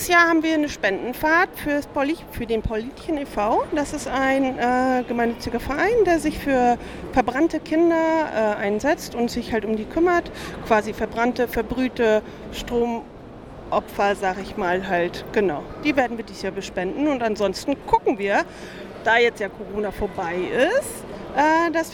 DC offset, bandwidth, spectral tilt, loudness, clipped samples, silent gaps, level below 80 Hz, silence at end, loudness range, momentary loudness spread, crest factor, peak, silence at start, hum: under 0.1%; 18.5 kHz; -4.5 dB/octave; -22 LUFS; under 0.1%; none; -44 dBFS; 0 s; 3 LU; 10 LU; 18 dB; -4 dBFS; 0 s; none